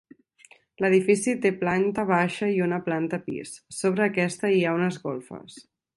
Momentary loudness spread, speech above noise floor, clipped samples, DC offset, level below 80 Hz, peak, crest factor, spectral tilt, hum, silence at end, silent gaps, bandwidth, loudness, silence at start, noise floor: 13 LU; 32 dB; under 0.1%; under 0.1%; -66 dBFS; -8 dBFS; 18 dB; -5.5 dB/octave; none; 0.35 s; none; 11.5 kHz; -25 LUFS; 0.8 s; -56 dBFS